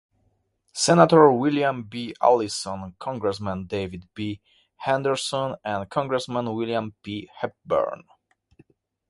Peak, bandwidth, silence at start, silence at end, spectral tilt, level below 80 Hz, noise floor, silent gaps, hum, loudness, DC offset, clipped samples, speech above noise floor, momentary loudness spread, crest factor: 0 dBFS; 11.5 kHz; 0.75 s; 1.15 s; -5 dB/octave; -56 dBFS; -69 dBFS; none; none; -23 LUFS; under 0.1%; under 0.1%; 46 dB; 17 LU; 24 dB